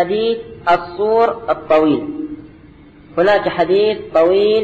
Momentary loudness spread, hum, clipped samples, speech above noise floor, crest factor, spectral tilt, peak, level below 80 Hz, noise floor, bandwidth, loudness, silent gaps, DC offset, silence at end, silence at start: 12 LU; none; under 0.1%; 27 dB; 12 dB; -7 dB/octave; -4 dBFS; -48 dBFS; -42 dBFS; 7.6 kHz; -16 LUFS; none; under 0.1%; 0 s; 0 s